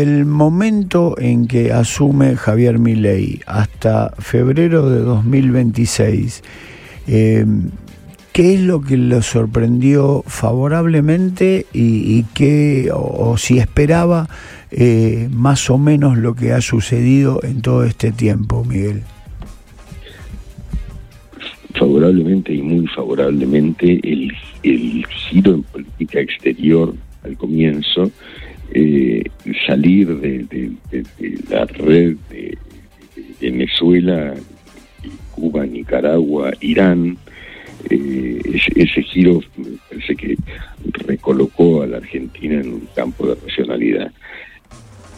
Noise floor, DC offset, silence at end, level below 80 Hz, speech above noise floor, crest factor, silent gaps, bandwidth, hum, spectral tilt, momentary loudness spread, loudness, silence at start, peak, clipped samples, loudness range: -40 dBFS; under 0.1%; 0 s; -36 dBFS; 26 dB; 14 dB; none; 14 kHz; none; -7 dB/octave; 18 LU; -15 LUFS; 0 s; 0 dBFS; under 0.1%; 5 LU